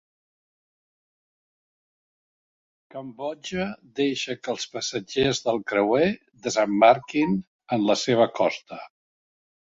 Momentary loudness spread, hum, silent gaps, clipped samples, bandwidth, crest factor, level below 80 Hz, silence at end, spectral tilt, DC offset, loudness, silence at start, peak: 15 LU; none; 7.47-7.59 s; under 0.1%; 8 kHz; 22 dB; -60 dBFS; 0.9 s; -4.5 dB/octave; under 0.1%; -24 LUFS; 2.95 s; -4 dBFS